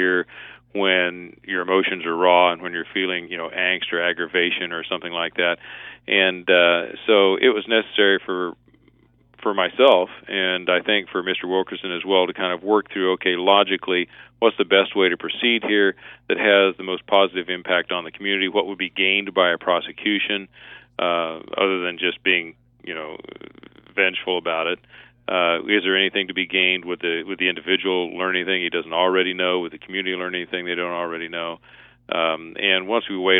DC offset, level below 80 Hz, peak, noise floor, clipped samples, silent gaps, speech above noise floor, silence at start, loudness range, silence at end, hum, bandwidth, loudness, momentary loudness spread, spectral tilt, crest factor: under 0.1%; -66 dBFS; -2 dBFS; -57 dBFS; under 0.1%; none; 35 dB; 0 s; 5 LU; 0 s; none; 4 kHz; -20 LUFS; 11 LU; -7 dB/octave; 20 dB